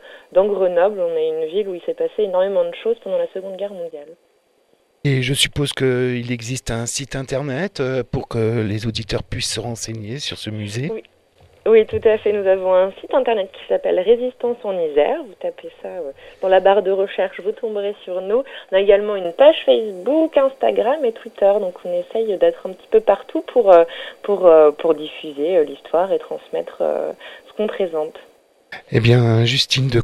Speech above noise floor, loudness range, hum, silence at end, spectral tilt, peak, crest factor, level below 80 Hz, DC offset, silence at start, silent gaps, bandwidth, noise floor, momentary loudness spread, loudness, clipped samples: 42 dB; 7 LU; none; 0 s; -5.5 dB/octave; 0 dBFS; 18 dB; -46 dBFS; under 0.1%; 0.05 s; none; 13.5 kHz; -60 dBFS; 14 LU; -18 LUFS; under 0.1%